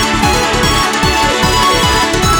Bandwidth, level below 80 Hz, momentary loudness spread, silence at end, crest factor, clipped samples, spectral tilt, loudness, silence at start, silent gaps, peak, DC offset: over 20 kHz; -22 dBFS; 2 LU; 0 s; 12 dB; under 0.1%; -3 dB/octave; -11 LUFS; 0 s; none; 0 dBFS; under 0.1%